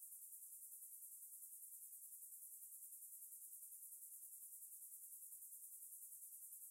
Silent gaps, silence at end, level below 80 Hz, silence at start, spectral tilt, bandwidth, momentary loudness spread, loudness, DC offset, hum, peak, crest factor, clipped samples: none; 0 s; under -90 dBFS; 0 s; 4.5 dB/octave; 16 kHz; 0 LU; -55 LUFS; under 0.1%; none; -44 dBFS; 14 dB; under 0.1%